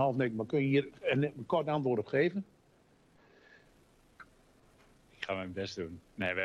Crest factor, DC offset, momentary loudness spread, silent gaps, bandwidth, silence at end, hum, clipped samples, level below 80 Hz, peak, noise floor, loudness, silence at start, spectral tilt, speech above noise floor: 18 dB; under 0.1%; 12 LU; none; 10 kHz; 0 s; none; under 0.1%; -70 dBFS; -18 dBFS; -66 dBFS; -33 LUFS; 0 s; -7 dB/octave; 34 dB